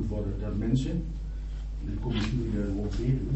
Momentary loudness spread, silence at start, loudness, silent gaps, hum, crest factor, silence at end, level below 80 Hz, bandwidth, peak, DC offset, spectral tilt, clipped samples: 10 LU; 0 s; -31 LUFS; none; none; 16 dB; 0 s; -34 dBFS; 8.2 kHz; -14 dBFS; under 0.1%; -7.5 dB/octave; under 0.1%